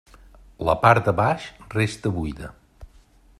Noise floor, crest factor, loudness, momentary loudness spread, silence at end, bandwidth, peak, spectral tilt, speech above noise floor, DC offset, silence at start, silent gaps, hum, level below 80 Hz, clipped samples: -54 dBFS; 22 dB; -22 LUFS; 15 LU; 0.55 s; 13 kHz; -2 dBFS; -6.5 dB/octave; 32 dB; under 0.1%; 0.6 s; none; none; -44 dBFS; under 0.1%